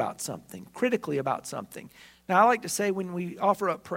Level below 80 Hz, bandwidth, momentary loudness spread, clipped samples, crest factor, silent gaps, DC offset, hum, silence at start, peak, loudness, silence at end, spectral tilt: -70 dBFS; 16 kHz; 20 LU; under 0.1%; 22 dB; none; under 0.1%; none; 0 s; -8 dBFS; -27 LUFS; 0 s; -4.5 dB/octave